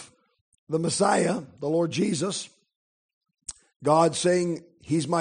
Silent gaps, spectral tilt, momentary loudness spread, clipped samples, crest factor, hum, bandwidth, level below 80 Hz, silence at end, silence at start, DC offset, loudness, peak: 0.41-0.52 s, 0.59-0.67 s, 2.76-3.21 s, 3.76-3.80 s; -5 dB/octave; 19 LU; under 0.1%; 20 dB; none; 10 kHz; -66 dBFS; 0 s; 0 s; under 0.1%; -25 LUFS; -6 dBFS